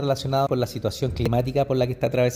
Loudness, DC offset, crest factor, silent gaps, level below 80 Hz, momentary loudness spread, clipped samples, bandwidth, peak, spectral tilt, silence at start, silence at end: -24 LUFS; under 0.1%; 12 dB; none; -42 dBFS; 4 LU; under 0.1%; 16 kHz; -10 dBFS; -6.5 dB/octave; 0 s; 0 s